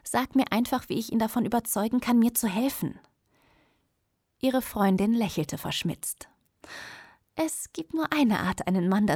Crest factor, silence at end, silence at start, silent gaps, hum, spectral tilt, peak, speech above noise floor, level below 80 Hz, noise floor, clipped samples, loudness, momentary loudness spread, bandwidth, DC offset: 20 dB; 0 s; 0.05 s; none; none; -5 dB/octave; -8 dBFS; 50 dB; -58 dBFS; -76 dBFS; under 0.1%; -27 LUFS; 15 LU; over 20 kHz; under 0.1%